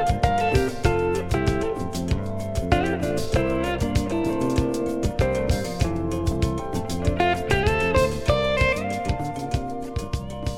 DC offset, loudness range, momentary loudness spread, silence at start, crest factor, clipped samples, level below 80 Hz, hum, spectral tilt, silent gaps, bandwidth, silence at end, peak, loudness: under 0.1%; 2 LU; 7 LU; 0 s; 18 dB; under 0.1%; -32 dBFS; none; -6 dB/octave; none; 16.5 kHz; 0 s; -4 dBFS; -24 LUFS